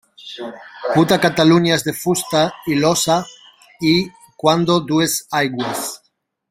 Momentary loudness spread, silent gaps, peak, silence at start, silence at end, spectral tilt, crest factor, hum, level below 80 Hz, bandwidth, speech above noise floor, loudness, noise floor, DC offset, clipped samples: 17 LU; none; -2 dBFS; 0.2 s; 0.55 s; -4.5 dB/octave; 16 dB; none; -54 dBFS; 16.5 kHz; 50 dB; -17 LUFS; -67 dBFS; under 0.1%; under 0.1%